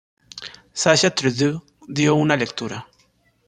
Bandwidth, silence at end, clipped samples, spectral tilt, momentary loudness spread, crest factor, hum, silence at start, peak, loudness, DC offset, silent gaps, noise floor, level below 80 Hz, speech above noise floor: 10 kHz; 0.65 s; under 0.1%; -4 dB/octave; 20 LU; 20 dB; none; 0.35 s; -2 dBFS; -19 LUFS; under 0.1%; none; -61 dBFS; -58 dBFS; 42 dB